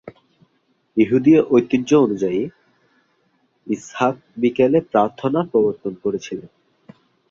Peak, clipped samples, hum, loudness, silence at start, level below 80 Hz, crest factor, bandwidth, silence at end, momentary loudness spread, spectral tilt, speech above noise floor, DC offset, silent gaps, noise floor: -2 dBFS; under 0.1%; none; -19 LUFS; 0.05 s; -60 dBFS; 18 dB; 7.4 kHz; 0.85 s; 13 LU; -7 dB/octave; 47 dB; under 0.1%; none; -65 dBFS